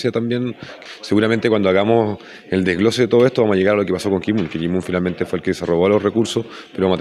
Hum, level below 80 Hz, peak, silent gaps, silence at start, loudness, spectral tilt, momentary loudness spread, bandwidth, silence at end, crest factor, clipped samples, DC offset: none; -52 dBFS; -2 dBFS; none; 0 s; -18 LUFS; -6.5 dB/octave; 9 LU; 13 kHz; 0 s; 16 dB; under 0.1%; under 0.1%